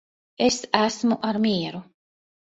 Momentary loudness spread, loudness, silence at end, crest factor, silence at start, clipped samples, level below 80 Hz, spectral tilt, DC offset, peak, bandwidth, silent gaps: 8 LU; -23 LUFS; 0.7 s; 24 dB; 0.4 s; under 0.1%; -62 dBFS; -4 dB/octave; under 0.1%; -2 dBFS; 8 kHz; none